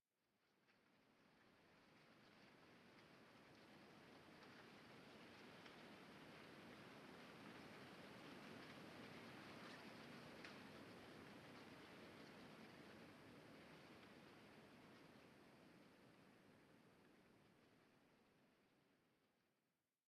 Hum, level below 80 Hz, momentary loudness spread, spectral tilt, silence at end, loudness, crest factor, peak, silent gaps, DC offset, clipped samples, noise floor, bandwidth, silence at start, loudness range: none; under -90 dBFS; 9 LU; -4.5 dB/octave; 0.45 s; -63 LUFS; 22 dB; -42 dBFS; none; under 0.1%; under 0.1%; under -90 dBFS; 13 kHz; 0.25 s; 8 LU